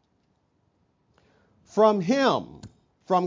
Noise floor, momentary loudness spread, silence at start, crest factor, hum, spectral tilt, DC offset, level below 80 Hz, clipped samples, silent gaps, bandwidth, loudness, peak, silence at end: -70 dBFS; 11 LU; 1.75 s; 20 dB; none; -6 dB/octave; under 0.1%; -66 dBFS; under 0.1%; none; 7.6 kHz; -23 LUFS; -6 dBFS; 0 s